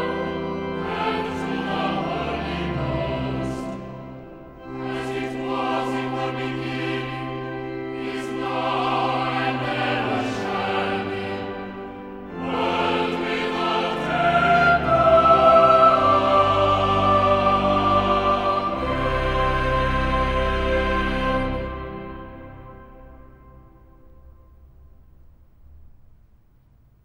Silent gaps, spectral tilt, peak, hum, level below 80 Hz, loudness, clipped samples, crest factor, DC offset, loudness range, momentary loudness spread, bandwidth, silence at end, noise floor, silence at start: none; -6.5 dB/octave; -4 dBFS; none; -36 dBFS; -21 LUFS; under 0.1%; 20 dB; under 0.1%; 12 LU; 16 LU; 12 kHz; 1.2 s; -55 dBFS; 0 s